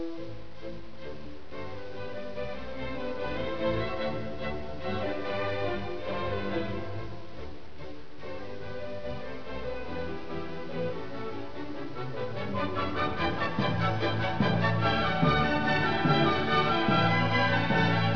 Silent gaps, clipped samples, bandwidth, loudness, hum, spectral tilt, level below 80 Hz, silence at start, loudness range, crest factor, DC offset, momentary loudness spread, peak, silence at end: none; under 0.1%; 5.4 kHz; -30 LUFS; none; -7 dB/octave; -50 dBFS; 0 s; 13 LU; 18 dB; 2%; 18 LU; -12 dBFS; 0 s